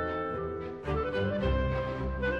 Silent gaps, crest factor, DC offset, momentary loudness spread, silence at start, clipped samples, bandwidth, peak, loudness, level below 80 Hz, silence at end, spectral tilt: none; 14 dB; under 0.1%; 6 LU; 0 s; under 0.1%; 6.6 kHz; -16 dBFS; -32 LUFS; -38 dBFS; 0 s; -8 dB/octave